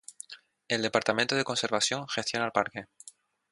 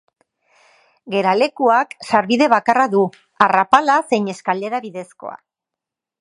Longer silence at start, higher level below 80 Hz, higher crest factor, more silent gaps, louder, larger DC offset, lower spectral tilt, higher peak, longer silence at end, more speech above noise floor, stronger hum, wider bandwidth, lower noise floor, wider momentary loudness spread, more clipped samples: second, 0.1 s vs 1.05 s; second, -72 dBFS vs -64 dBFS; first, 24 dB vs 18 dB; neither; second, -28 LUFS vs -17 LUFS; neither; second, -2.5 dB/octave vs -5 dB/octave; second, -8 dBFS vs 0 dBFS; second, 0.4 s vs 0.85 s; second, 26 dB vs 68 dB; neither; about the same, 11.5 kHz vs 11.5 kHz; second, -55 dBFS vs -85 dBFS; first, 19 LU vs 15 LU; neither